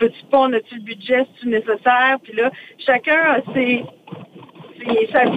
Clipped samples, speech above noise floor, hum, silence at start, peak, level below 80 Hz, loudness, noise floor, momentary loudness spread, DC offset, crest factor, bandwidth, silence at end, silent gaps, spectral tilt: under 0.1%; 23 dB; none; 0 s; -2 dBFS; -62 dBFS; -18 LUFS; -41 dBFS; 17 LU; under 0.1%; 16 dB; 8.6 kHz; 0 s; none; -6.5 dB/octave